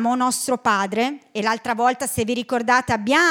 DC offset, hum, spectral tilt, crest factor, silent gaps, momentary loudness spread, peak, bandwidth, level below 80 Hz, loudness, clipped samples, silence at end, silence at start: under 0.1%; none; -3 dB/octave; 16 dB; none; 5 LU; -4 dBFS; 18.5 kHz; -56 dBFS; -21 LUFS; under 0.1%; 0 s; 0 s